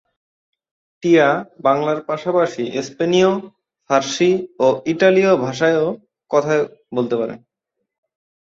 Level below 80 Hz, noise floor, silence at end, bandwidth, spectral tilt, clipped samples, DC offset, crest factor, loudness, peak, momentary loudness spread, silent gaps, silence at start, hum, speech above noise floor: -64 dBFS; -78 dBFS; 1.1 s; 7.8 kHz; -5.5 dB/octave; under 0.1%; under 0.1%; 16 dB; -18 LUFS; -2 dBFS; 10 LU; none; 1.05 s; none; 61 dB